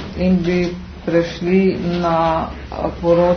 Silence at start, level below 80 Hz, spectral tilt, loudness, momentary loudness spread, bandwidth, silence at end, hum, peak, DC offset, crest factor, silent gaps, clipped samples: 0 s; -36 dBFS; -8 dB/octave; -18 LUFS; 9 LU; 6.6 kHz; 0 s; none; -2 dBFS; under 0.1%; 14 dB; none; under 0.1%